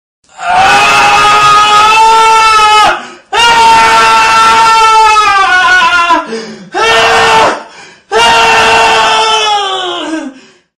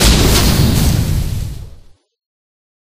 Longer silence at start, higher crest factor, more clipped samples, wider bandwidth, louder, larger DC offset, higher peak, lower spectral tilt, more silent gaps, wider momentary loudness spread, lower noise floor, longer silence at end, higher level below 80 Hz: first, 0.4 s vs 0 s; second, 6 dB vs 14 dB; first, 0.1% vs under 0.1%; about the same, 15.5 kHz vs 15.5 kHz; first, -5 LUFS vs -13 LUFS; neither; about the same, 0 dBFS vs 0 dBFS; second, -1 dB/octave vs -4.5 dB/octave; neither; second, 11 LU vs 15 LU; second, -32 dBFS vs -39 dBFS; second, 0.45 s vs 1.25 s; second, -38 dBFS vs -18 dBFS